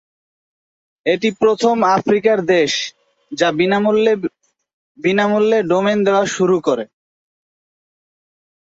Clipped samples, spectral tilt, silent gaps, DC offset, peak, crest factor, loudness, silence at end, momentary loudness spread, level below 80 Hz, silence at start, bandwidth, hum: under 0.1%; -5 dB/octave; 4.73-4.95 s; under 0.1%; -2 dBFS; 16 dB; -16 LUFS; 1.8 s; 8 LU; -62 dBFS; 1.05 s; 8 kHz; none